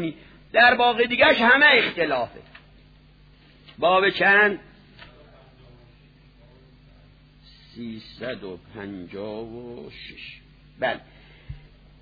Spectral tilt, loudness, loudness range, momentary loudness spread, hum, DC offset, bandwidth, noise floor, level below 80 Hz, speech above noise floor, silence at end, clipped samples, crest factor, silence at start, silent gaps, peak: -6 dB/octave; -18 LUFS; 20 LU; 23 LU; 50 Hz at -55 dBFS; under 0.1%; 5 kHz; -53 dBFS; -54 dBFS; 31 dB; 0.45 s; under 0.1%; 20 dB; 0 s; none; -4 dBFS